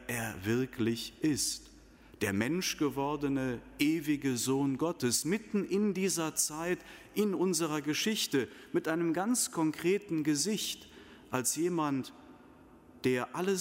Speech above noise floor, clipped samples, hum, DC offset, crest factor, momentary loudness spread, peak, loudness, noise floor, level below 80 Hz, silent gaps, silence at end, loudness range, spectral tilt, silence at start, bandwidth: 25 dB; under 0.1%; none; under 0.1%; 18 dB; 6 LU; -16 dBFS; -32 LUFS; -57 dBFS; -64 dBFS; none; 0 s; 2 LU; -4 dB/octave; 0 s; 16 kHz